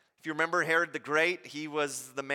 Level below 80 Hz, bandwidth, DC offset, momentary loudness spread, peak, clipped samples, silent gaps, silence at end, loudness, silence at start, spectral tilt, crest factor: -84 dBFS; 17 kHz; under 0.1%; 10 LU; -12 dBFS; under 0.1%; none; 0 s; -30 LUFS; 0.25 s; -3 dB/octave; 18 dB